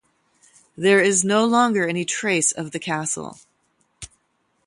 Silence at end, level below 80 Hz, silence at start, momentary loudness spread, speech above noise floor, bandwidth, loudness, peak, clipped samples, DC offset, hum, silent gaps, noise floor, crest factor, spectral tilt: 0.6 s; -62 dBFS; 0.8 s; 24 LU; 48 dB; 11.5 kHz; -20 LUFS; -4 dBFS; under 0.1%; under 0.1%; none; none; -68 dBFS; 20 dB; -3 dB/octave